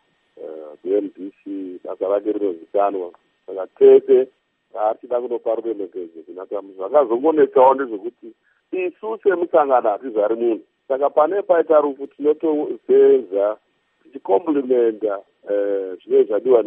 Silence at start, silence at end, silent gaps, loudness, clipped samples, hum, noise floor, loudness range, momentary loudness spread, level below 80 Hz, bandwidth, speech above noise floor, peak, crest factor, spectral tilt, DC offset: 0.4 s; 0 s; none; -19 LUFS; under 0.1%; none; -39 dBFS; 4 LU; 18 LU; -82 dBFS; 3.6 kHz; 20 dB; -2 dBFS; 18 dB; -9.5 dB/octave; under 0.1%